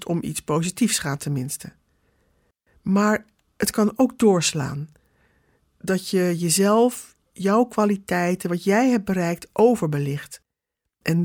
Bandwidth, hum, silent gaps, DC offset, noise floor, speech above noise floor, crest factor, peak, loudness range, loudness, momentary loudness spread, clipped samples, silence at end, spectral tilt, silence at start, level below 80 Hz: 19 kHz; none; none; under 0.1%; -82 dBFS; 61 dB; 18 dB; -6 dBFS; 4 LU; -22 LUFS; 13 LU; under 0.1%; 0 s; -5 dB/octave; 0 s; -58 dBFS